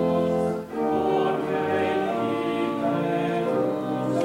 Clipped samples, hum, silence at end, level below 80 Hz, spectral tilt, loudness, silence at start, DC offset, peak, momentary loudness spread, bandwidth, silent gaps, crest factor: under 0.1%; none; 0 s; -60 dBFS; -7 dB/octave; -25 LUFS; 0 s; under 0.1%; -12 dBFS; 3 LU; 16 kHz; none; 12 dB